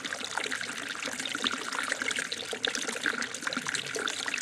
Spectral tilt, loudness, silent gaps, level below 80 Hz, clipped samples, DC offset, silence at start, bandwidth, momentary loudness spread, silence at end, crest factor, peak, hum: -0.5 dB/octave; -31 LUFS; none; -72 dBFS; under 0.1%; under 0.1%; 0 s; 16.5 kHz; 3 LU; 0 s; 24 dB; -10 dBFS; none